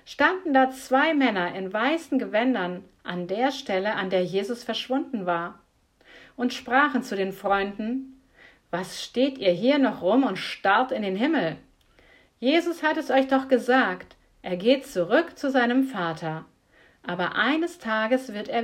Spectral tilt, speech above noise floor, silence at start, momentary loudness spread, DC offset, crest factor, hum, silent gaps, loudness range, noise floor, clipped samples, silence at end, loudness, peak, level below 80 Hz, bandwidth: -5 dB/octave; 35 dB; 0.05 s; 11 LU; under 0.1%; 20 dB; none; none; 4 LU; -59 dBFS; under 0.1%; 0 s; -25 LUFS; -6 dBFS; -64 dBFS; 15.5 kHz